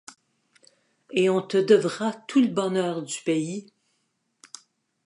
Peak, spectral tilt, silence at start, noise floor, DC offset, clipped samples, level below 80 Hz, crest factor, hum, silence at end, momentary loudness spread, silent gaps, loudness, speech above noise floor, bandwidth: -6 dBFS; -5 dB/octave; 1.1 s; -74 dBFS; under 0.1%; under 0.1%; -78 dBFS; 20 dB; none; 1.4 s; 24 LU; none; -24 LUFS; 51 dB; 11.5 kHz